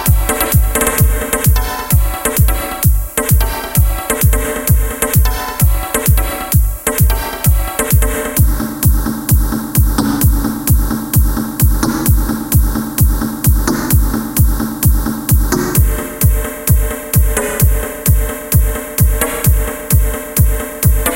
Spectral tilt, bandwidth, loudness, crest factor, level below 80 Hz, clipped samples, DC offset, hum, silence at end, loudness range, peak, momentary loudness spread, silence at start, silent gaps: -5 dB/octave; 17.5 kHz; -14 LUFS; 12 dB; -16 dBFS; under 0.1%; under 0.1%; none; 0 s; 1 LU; 0 dBFS; 2 LU; 0 s; none